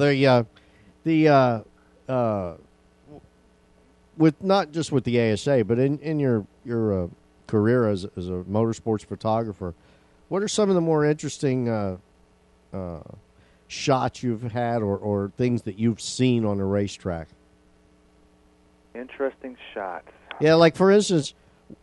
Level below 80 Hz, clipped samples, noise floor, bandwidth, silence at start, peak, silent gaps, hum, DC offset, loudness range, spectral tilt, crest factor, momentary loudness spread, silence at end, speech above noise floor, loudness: -56 dBFS; under 0.1%; -58 dBFS; 11.5 kHz; 0 s; -4 dBFS; none; none; under 0.1%; 6 LU; -6 dB/octave; 20 dB; 17 LU; 0.1 s; 36 dB; -23 LUFS